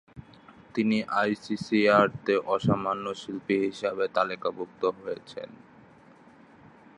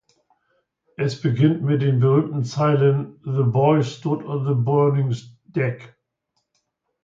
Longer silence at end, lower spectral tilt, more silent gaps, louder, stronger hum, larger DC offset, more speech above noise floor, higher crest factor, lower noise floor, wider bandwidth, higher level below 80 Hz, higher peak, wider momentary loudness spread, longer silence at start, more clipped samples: first, 1.4 s vs 1.2 s; second, -6.5 dB/octave vs -8.5 dB/octave; neither; second, -27 LUFS vs -21 LUFS; neither; neither; second, 27 dB vs 55 dB; about the same, 22 dB vs 18 dB; second, -54 dBFS vs -74 dBFS; first, 10.5 kHz vs 7.6 kHz; about the same, -62 dBFS vs -62 dBFS; about the same, -6 dBFS vs -4 dBFS; first, 15 LU vs 9 LU; second, 0.15 s vs 1 s; neither